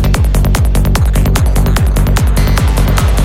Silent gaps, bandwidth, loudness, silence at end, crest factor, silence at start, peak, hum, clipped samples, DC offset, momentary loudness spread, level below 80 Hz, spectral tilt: none; 16.5 kHz; -12 LUFS; 0 s; 10 dB; 0 s; 0 dBFS; none; under 0.1%; under 0.1%; 0 LU; -12 dBFS; -5.5 dB/octave